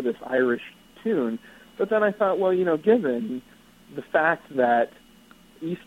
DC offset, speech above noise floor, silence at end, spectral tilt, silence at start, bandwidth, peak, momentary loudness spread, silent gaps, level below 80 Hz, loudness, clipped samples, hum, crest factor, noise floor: under 0.1%; 29 dB; 0.1 s; -7 dB/octave; 0 s; 15.5 kHz; -6 dBFS; 15 LU; none; -64 dBFS; -24 LUFS; under 0.1%; none; 18 dB; -53 dBFS